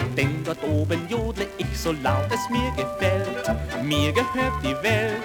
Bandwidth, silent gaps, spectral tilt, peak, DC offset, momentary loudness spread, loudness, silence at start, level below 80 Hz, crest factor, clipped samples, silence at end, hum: over 20 kHz; none; -5.5 dB/octave; -6 dBFS; under 0.1%; 5 LU; -24 LUFS; 0 s; -38 dBFS; 18 dB; under 0.1%; 0 s; none